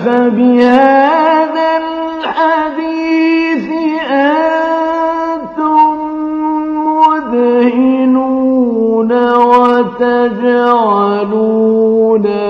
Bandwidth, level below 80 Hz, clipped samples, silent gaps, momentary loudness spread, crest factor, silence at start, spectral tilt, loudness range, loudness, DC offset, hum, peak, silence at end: 6.8 kHz; -52 dBFS; 0.3%; none; 8 LU; 10 dB; 0 s; -7 dB/octave; 3 LU; -11 LUFS; under 0.1%; none; 0 dBFS; 0 s